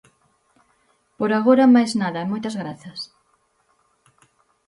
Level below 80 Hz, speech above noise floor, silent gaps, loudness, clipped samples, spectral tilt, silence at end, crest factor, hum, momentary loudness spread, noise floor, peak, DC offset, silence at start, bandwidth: -68 dBFS; 46 dB; none; -19 LUFS; under 0.1%; -6 dB/octave; 1.65 s; 18 dB; none; 20 LU; -65 dBFS; -4 dBFS; under 0.1%; 1.2 s; 11 kHz